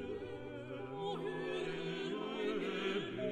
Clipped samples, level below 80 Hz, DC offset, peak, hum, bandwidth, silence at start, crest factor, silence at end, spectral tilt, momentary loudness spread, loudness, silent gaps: under 0.1%; -70 dBFS; under 0.1%; -26 dBFS; none; 9.4 kHz; 0 s; 14 dB; 0 s; -6 dB/octave; 8 LU; -41 LUFS; none